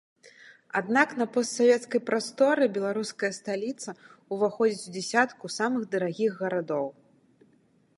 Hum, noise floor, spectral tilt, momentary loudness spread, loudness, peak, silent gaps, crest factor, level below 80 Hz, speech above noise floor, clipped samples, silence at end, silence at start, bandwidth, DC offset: none; -64 dBFS; -4 dB/octave; 10 LU; -27 LUFS; -6 dBFS; none; 22 dB; -82 dBFS; 37 dB; under 0.1%; 1.05 s; 0.25 s; 11.5 kHz; under 0.1%